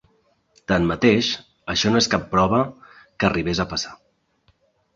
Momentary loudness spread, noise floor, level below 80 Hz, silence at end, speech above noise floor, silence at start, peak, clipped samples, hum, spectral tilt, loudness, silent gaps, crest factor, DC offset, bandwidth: 11 LU; -64 dBFS; -44 dBFS; 1 s; 43 dB; 0.7 s; -2 dBFS; under 0.1%; none; -4.5 dB/octave; -21 LUFS; none; 20 dB; under 0.1%; 7.8 kHz